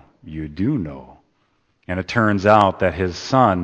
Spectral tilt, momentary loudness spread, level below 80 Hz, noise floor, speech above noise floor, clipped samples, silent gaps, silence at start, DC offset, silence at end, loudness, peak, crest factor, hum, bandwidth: -6.5 dB/octave; 18 LU; -46 dBFS; -65 dBFS; 47 dB; under 0.1%; none; 0.25 s; under 0.1%; 0 s; -18 LUFS; 0 dBFS; 20 dB; none; 8.6 kHz